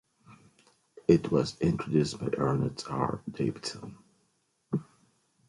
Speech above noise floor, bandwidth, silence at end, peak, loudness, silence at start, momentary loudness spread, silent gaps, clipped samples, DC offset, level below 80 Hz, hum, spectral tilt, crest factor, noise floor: 45 dB; 11.5 kHz; 0.65 s; -8 dBFS; -30 LUFS; 0.3 s; 12 LU; none; under 0.1%; under 0.1%; -56 dBFS; none; -7 dB/octave; 22 dB; -74 dBFS